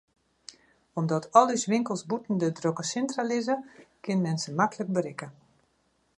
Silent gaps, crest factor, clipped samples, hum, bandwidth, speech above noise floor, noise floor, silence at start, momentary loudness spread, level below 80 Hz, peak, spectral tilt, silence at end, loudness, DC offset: none; 24 dB; under 0.1%; none; 11 kHz; 43 dB; -71 dBFS; 0.95 s; 20 LU; -74 dBFS; -4 dBFS; -5.5 dB/octave; 0.85 s; -28 LUFS; under 0.1%